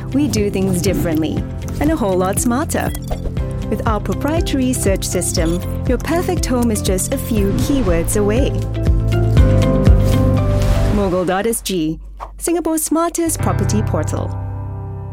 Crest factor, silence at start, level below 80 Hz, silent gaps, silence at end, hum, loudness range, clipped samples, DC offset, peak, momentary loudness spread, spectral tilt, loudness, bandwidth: 16 dB; 0 s; -24 dBFS; none; 0 s; none; 4 LU; under 0.1%; under 0.1%; 0 dBFS; 9 LU; -6 dB/octave; -17 LUFS; 17 kHz